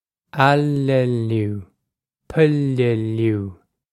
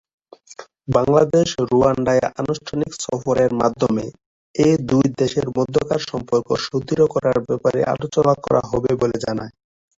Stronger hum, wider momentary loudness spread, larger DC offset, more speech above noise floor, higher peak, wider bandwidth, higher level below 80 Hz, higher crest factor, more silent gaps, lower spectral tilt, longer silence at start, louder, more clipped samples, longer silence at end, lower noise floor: neither; first, 11 LU vs 8 LU; neither; first, 61 dB vs 24 dB; about the same, 0 dBFS vs -2 dBFS; first, 12.5 kHz vs 8 kHz; second, -54 dBFS vs -48 dBFS; about the same, 18 dB vs 16 dB; second, none vs 4.26-4.54 s; first, -8 dB/octave vs -6 dB/octave; second, 0.35 s vs 0.5 s; about the same, -19 LUFS vs -19 LUFS; neither; about the same, 0.4 s vs 0.5 s; first, -79 dBFS vs -42 dBFS